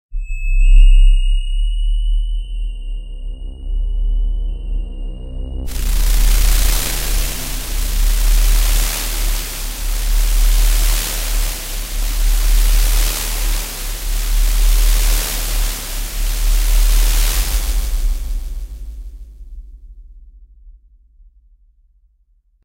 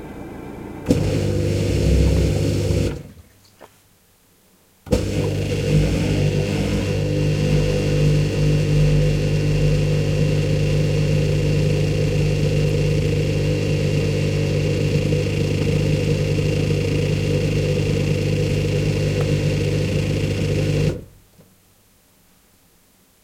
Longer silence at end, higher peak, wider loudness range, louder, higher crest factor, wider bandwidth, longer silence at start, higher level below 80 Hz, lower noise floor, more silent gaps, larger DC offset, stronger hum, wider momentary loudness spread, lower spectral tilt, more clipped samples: second, 1.95 s vs 2.2 s; about the same, 0 dBFS vs -2 dBFS; first, 8 LU vs 5 LU; about the same, -19 LUFS vs -20 LUFS; about the same, 14 dB vs 18 dB; first, 16 kHz vs 14 kHz; about the same, 0.1 s vs 0 s; first, -16 dBFS vs -30 dBFS; about the same, -57 dBFS vs -56 dBFS; neither; neither; neither; first, 14 LU vs 4 LU; second, -2.5 dB/octave vs -7 dB/octave; neither